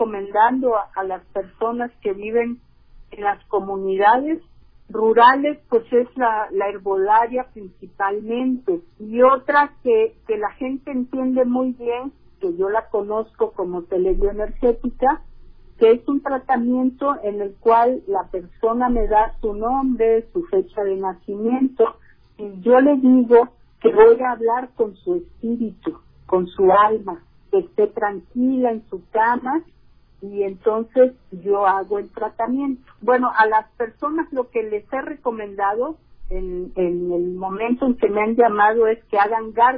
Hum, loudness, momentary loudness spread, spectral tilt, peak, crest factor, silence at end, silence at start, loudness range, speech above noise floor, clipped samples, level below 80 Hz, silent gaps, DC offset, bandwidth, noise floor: none; -20 LUFS; 12 LU; -9.5 dB/octave; -2 dBFS; 16 dB; 0 s; 0 s; 6 LU; 23 dB; under 0.1%; -40 dBFS; none; under 0.1%; 4.9 kHz; -42 dBFS